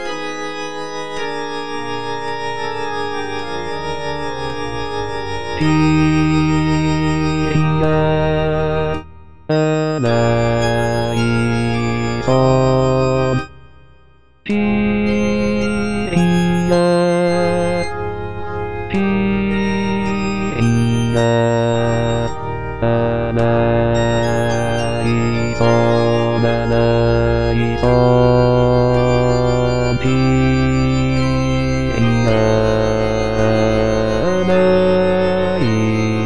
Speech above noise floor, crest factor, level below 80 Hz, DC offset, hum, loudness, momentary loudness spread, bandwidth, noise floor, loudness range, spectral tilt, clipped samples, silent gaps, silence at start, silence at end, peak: 37 dB; 14 dB; -32 dBFS; 4%; none; -17 LUFS; 10 LU; 10.5 kHz; -50 dBFS; 5 LU; -7 dB/octave; under 0.1%; none; 0 s; 0 s; -2 dBFS